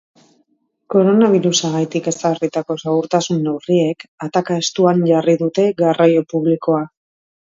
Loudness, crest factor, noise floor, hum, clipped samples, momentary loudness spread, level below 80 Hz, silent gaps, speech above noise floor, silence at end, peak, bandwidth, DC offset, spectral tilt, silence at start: -16 LUFS; 16 dB; -63 dBFS; none; under 0.1%; 8 LU; -64 dBFS; 4.08-4.18 s; 48 dB; 0.6 s; 0 dBFS; 7.8 kHz; under 0.1%; -5.5 dB/octave; 0.9 s